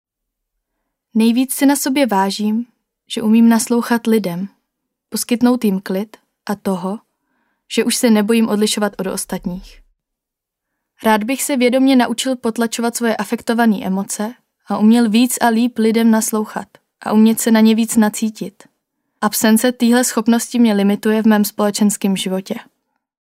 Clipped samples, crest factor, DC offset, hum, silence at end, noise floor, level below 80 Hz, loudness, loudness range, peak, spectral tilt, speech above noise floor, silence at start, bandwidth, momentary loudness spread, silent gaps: under 0.1%; 16 dB; under 0.1%; none; 0.6 s; -82 dBFS; -56 dBFS; -16 LUFS; 5 LU; -2 dBFS; -4.5 dB/octave; 67 dB; 1.15 s; 16 kHz; 13 LU; none